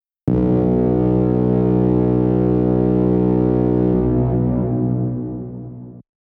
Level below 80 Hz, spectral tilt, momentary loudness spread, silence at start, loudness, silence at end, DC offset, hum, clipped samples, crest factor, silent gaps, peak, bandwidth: -32 dBFS; -13 dB/octave; 10 LU; 0.25 s; -17 LUFS; 0.25 s; under 0.1%; none; under 0.1%; 12 dB; none; -6 dBFS; 3.5 kHz